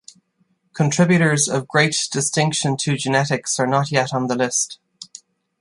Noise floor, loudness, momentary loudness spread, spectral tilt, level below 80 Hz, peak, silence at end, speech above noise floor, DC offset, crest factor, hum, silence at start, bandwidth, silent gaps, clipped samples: -65 dBFS; -19 LUFS; 15 LU; -4 dB/octave; -60 dBFS; -2 dBFS; 0.55 s; 46 dB; under 0.1%; 18 dB; none; 0.75 s; 11.5 kHz; none; under 0.1%